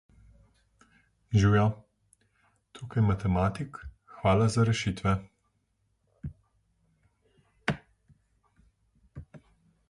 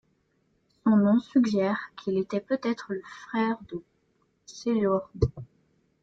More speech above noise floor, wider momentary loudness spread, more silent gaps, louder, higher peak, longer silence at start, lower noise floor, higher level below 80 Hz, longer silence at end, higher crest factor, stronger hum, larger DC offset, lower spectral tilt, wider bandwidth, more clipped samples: first, 49 dB vs 43 dB; first, 23 LU vs 14 LU; neither; about the same, -28 LUFS vs -27 LUFS; about the same, -10 dBFS vs -10 dBFS; first, 1.3 s vs 0.85 s; about the same, -74 dBFS vs -71 dBFS; about the same, -48 dBFS vs -50 dBFS; about the same, 0.55 s vs 0.6 s; about the same, 20 dB vs 18 dB; neither; neither; about the same, -6.5 dB/octave vs -7.5 dB/octave; first, 11 kHz vs 7.6 kHz; neither